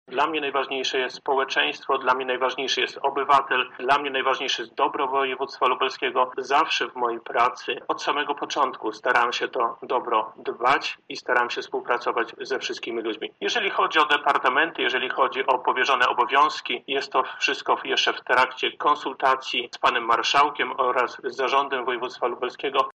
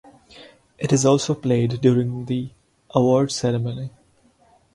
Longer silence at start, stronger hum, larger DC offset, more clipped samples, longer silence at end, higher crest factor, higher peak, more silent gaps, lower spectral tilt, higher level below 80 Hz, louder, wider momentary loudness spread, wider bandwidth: second, 0.1 s vs 0.35 s; neither; neither; neither; second, 0.05 s vs 0.85 s; about the same, 18 dB vs 20 dB; second, -6 dBFS vs -2 dBFS; neither; second, -2 dB/octave vs -6 dB/octave; second, -72 dBFS vs -56 dBFS; about the same, -23 LUFS vs -21 LUFS; second, 8 LU vs 12 LU; about the same, 10.5 kHz vs 11.5 kHz